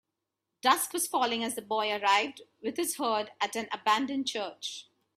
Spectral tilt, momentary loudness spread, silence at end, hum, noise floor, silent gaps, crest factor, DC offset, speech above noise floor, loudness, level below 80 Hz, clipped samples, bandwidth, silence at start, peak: -1 dB/octave; 11 LU; 0.35 s; none; -86 dBFS; none; 22 dB; under 0.1%; 56 dB; -30 LUFS; -80 dBFS; under 0.1%; 15.5 kHz; 0.65 s; -8 dBFS